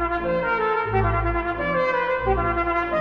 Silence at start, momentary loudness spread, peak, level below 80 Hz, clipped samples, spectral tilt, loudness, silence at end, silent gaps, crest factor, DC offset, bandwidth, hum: 0 s; 2 LU; -8 dBFS; -34 dBFS; under 0.1%; -8.5 dB/octave; -22 LUFS; 0 s; none; 14 dB; under 0.1%; 6.6 kHz; none